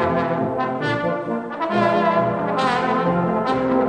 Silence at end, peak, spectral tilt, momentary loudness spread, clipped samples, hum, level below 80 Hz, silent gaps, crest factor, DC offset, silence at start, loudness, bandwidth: 0 s; -6 dBFS; -7 dB/octave; 5 LU; under 0.1%; none; -52 dBFS; none; 14 dB; under 0.1%; 0 s; -20 LUFS; 10 kHz